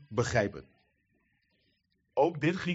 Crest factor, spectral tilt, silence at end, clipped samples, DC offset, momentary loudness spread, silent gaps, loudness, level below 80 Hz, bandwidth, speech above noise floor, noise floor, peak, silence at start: 20 dB; -5 dB/octave; 0 s; under 0.1%; under 0.1%; 8 LU; none; -30 LUFS; -60 dBFS; 8 kHz; 46 dB; -75 dBFS; -14 dBFS; 0.1 s